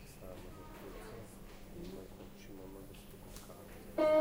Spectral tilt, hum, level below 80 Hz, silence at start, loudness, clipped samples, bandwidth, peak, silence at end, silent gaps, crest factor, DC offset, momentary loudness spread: -5.5 dB/octave; none; -56 dBFS; 0 s; -45 LUFS; under 0.1%; 16 kHz; -20 dBFS; 0 s; none; 20 dB; under 0.1%; 10 LU